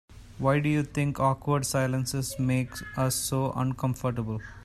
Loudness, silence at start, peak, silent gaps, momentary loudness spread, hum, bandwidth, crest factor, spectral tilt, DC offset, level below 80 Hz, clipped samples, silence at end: -28 LUFS; 0.1 s; -12 dBFS; none; 5 LU; none; 14 kHz; 16 dB; -5.5 dB/octave; under 0.1%; -50 dBFS; under 0.1%; 0 s